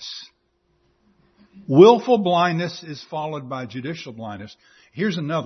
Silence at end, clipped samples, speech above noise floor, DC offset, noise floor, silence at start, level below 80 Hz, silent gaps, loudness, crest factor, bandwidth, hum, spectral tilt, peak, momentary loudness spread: 0 s; under 0.1%; 48 dB; under 0.1%; -67 dBFS; 0 s; -66 dBFS; none; -19 LUFS; 20 dB; 6.4 kHz; none; -6.5 dB/octave; 0 dBFS; 23 LU